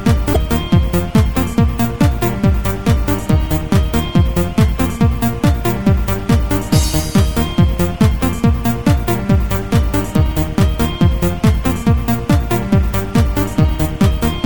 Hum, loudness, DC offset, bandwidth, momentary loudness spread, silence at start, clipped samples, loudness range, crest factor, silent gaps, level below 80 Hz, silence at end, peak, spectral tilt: none; -15 LUFS; 2%; 19.5 kHz; 2 LU; 0 s; under 0.1%; 0 LU; 12 dB; none; -20 dBFS; 0 s; 0 dBFS; -6.5 dB/octave